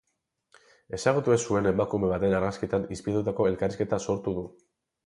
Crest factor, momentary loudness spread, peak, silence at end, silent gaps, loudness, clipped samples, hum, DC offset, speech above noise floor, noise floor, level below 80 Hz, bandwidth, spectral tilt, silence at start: 18 dB; 6 LU; -10 dBFS; 0.55 s; none; -27 LUFS; under 0.1%; none; under 0.1%; 50 dB; -76 dBFS; -52 dBFS; 11.5 kHz; -6 dB/octave; 0.9 s